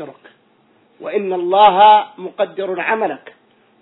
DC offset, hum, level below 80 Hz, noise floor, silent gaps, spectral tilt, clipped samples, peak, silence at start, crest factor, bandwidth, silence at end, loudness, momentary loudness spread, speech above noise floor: under 0.1%; none; -62 dBFS; -55 dBFS; none; -7.5 dB/octave; under 0.1%; 0 dBFS; 0 s; 16 dB; 4.1 kHz; 0.65 s; -14 LUFS; 22 LU; 41 dB